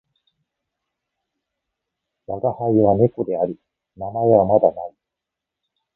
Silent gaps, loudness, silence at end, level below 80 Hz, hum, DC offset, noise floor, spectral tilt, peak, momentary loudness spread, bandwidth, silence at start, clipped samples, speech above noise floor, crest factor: none; -19 LUFS; 1.05 s; -54 dBFS; none; under 0.1%; -84 dBFS; -14.5 dB/octave; -2 dBFS; 19 LU; 3.8 kHz; 2.3 s; under 0.1%; 66 dB; 20 dB